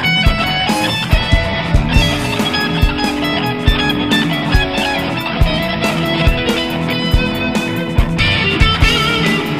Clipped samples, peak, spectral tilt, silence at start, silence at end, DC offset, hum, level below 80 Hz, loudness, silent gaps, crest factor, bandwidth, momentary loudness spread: under 0.1%; 0 dBFS; -5 dB/octave; 0 s; 0 s; 0.6%; none; -20 dBFS; -14 LUFS; none; 14 dB; 15.5 kHz; 5 LU